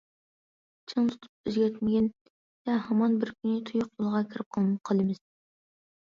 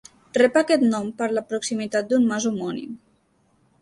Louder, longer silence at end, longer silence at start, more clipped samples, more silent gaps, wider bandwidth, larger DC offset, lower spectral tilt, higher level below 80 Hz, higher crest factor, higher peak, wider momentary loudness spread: second, -29 LUFS vs -22 LUFS; about the same, 0.85 s vs 0.85 s; first, 0.9 s vs 0.35 s; neither; first, 1.29-1.44 s, 2.21-2.65 s, 4.46-4.51 s vs none; second, 7.2 kHz vs 11.5 kHz; neither; first, -8 dB/octave vs -4.5 dB/octave; about the same, -68 dBFS vs -66 dBFS; about the same, 16 dB vs 18 dB; second, -14 dBFS vs -4 dBFS; second, 8 LU vs 12 LU